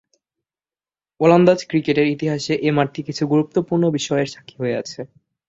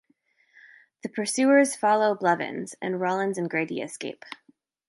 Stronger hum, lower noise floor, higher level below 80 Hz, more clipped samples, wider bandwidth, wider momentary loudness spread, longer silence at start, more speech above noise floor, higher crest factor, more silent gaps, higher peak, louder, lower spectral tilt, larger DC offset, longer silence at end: neither; first, under -90 dBFS vs -67 dBFS; first, -60 dBFS vs -78 dBFS; neither; second, 8 kHz vs 11.5 kHz; second, 13 LU vs 17 LU; first, 1.2 s vs 1.05 s; first, over 72 dB vs 42 dB; about the same, 18 dB vs 20 dB; neither; first, -2 dBFS vs -6 dBFS; first, -19 LUFS vs -25 LUFS; first, -6 dB/octave vs -4.5 dB/octave; neither; about the same, 0.45 s vs 0.55 s